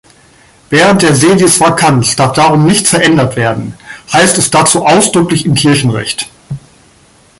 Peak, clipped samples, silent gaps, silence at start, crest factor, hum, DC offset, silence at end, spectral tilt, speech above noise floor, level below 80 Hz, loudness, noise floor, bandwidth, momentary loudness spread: 0 dBFS; 0.1%; none; 0.7 s; 10 dB; none; under 0.1%; 0.8 s; -4 dB/octave; 36 dB; -42 dBFS; -8 LUFS; -44 dBFS; 16 kHz; 13 LU